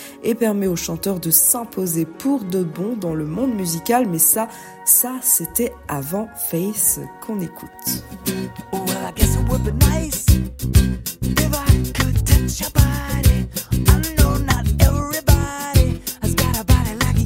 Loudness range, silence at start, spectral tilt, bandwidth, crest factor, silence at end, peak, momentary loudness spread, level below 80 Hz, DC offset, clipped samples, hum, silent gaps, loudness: 4 LU; 0 s; -4.5 dB/octave; 16.5 kHz; 18 dB; 0 s; 0 dBFS; 10 LU; -24 dBFS; under 0.1%; under 0.1%; none; none; -19 LUFS